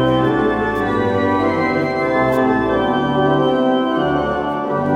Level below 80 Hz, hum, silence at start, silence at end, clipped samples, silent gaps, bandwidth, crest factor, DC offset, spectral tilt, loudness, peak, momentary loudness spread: -40 dBFS; none; 0 s; 0 s; under 0.1%; none; 15.5 kHz; 12 dB; under 0.1%; -7.5 dB/octave; -17 LUFS; -4 dBFS; 3 LU